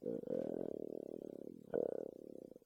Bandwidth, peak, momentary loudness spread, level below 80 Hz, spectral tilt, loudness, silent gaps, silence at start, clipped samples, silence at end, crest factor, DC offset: 16.5 kHz; -24 dBFS; 11 LU; -80 dBFS; -9 dB/octave; -45 LUFS; none; 0 s; under 0.1%; 0.05 s; 20 dB; under 0.1%